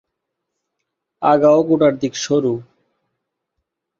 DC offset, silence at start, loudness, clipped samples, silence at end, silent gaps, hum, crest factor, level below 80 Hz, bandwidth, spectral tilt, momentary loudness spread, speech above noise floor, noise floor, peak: under 0.1%; 1.2 s; -16 LUFS; under 0.1%; 1.35 s; none; none; 18 dB; -62 dBFS; 7.8 kHz; -5.5 dB/octave; 10 LU; 63 dB; -78 dBFS; -2 dBFS